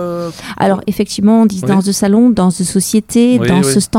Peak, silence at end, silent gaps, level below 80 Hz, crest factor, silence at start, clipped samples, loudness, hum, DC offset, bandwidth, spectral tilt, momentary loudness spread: 0 dBFS; 0 s; none; -42 dBFS; 12 dB; 0 s; under 0.1%; -12 LUFS; none; under 0.1%; 16.5 kHz; -5.5 dB/octave; 7 LU